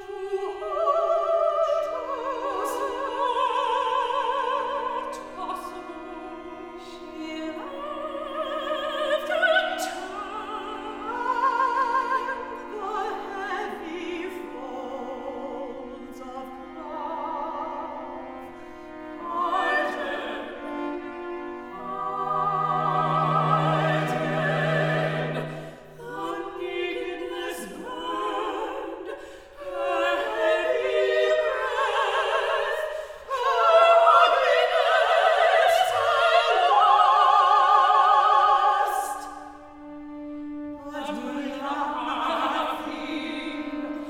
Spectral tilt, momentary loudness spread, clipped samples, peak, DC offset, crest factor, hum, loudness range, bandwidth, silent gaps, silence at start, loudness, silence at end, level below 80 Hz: -4.5 dB/octave; 20 LU; under 0.1%; -6 dBFS; under 0.1%; 20 dB; none; 15 LU; 17 kHz; none; 0 s; -24 LUFS; 0 s; -60 dBFS